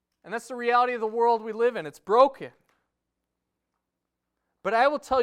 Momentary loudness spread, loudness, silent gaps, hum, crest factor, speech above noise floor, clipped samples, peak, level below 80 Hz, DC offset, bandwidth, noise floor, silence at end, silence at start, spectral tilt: 15 LU; -24 LUFS; none; 60 Hz at -75 dBFS; 20 dB; 59 dB; under 0.1%; -6 dBFS; -64 dBFS; under 0.1%; 12.5 kHz; -84 dBFS; 0 s; 0.25 s; -4.5 dB/octave